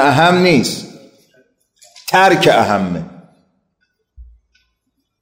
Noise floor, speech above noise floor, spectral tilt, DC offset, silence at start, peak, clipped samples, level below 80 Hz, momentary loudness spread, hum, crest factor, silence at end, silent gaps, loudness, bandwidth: -70 dBFS; 58 dB; -5 dB/octave; under 0.1%; 0 s; 0 dBFS; under 0.1%; -50 dBFS; 19 LU; none; 16 dB; 1 s; none; -12 LUFS; 16 kHz